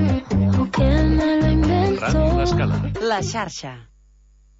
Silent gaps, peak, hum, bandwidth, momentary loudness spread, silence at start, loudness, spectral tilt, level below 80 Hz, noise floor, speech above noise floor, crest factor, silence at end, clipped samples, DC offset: none; -8 dBFS; none; 8 kHz; 8 LU; 0 s; -19 LUFS; -7 dB/octave; -26 dBFS; -52 dBFS; 30 dB; 12 dB; 0.75 s; under 0.1%; under 0.1%